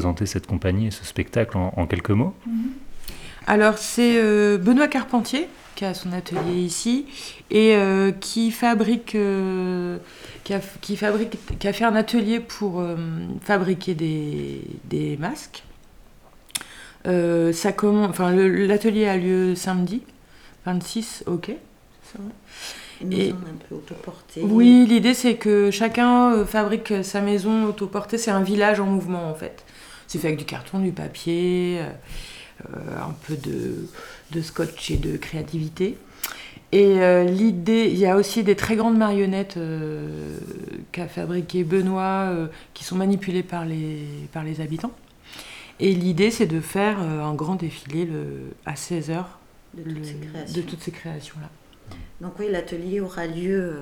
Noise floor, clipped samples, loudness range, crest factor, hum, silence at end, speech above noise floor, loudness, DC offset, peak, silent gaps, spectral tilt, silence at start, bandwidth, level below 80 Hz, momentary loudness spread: -49 dBFS; under 0.1%; 11 LU; 22 dB; none; 0 s; 27 dB; -22 LUFS; under 0.1%; 0 dBFS; none; -6 dB/octave; 0 s; 19.5 kHz; -48 dBFS; 18 LU